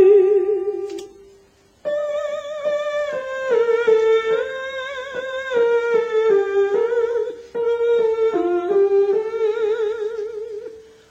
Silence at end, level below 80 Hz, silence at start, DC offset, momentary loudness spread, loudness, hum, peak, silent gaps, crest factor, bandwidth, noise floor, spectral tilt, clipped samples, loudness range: 0.3 s; -62 dBFS; 0 s; under 0.1%; 12 LU; -20 LUFS; none; -4 dBFS; none; 16 dB; 8 kHz; -53 dBFS; -4.5 dB/octave; under 0.1%; 3 LU